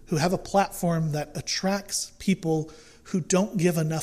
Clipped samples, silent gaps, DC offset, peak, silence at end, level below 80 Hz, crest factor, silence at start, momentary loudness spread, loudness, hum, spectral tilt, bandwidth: under 0.1%; none; under 0.1%; -10 dBFS; 0 s; -52 dBFS; 16 dB; 0.1 s; 6 LU; -26 LUFS; none; -5 dB/octave; 15.5 kHz